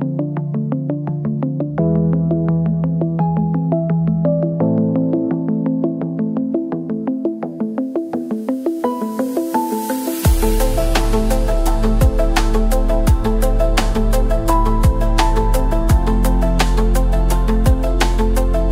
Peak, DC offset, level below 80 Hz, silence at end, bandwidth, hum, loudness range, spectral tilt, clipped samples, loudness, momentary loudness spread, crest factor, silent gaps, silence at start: 0 dBFS; under 0.1%; -18 dBFS; 0 s; 16.5 kHz; none; 4 LU; -6.5 dB/octave; under 0.1%; -18 LUFS; 5 LU; 14 dB; none; 0 s